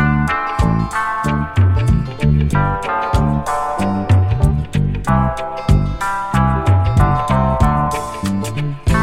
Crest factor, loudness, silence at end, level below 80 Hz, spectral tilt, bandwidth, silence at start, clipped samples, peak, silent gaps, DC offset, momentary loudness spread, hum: 14 dB; -17 LUFS; 0 s; -24 dBFS; -7 dB/octave; 14 kHz; 0 s; under 0.1%; 0 dBFS; none; under 0.1%; 6 LU; none